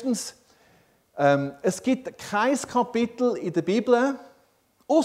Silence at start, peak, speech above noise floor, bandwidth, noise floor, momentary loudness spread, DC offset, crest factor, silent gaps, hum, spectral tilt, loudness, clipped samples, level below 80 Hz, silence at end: 0 s; -6 dBFS; 40 dB; 15.5 kHz; -64 dBFS; 8 LU; under 0.1%; 18 dB; none; none; -5 dB/octave; -25 LUFS; under 0.1%; -68 dBFS; 0 s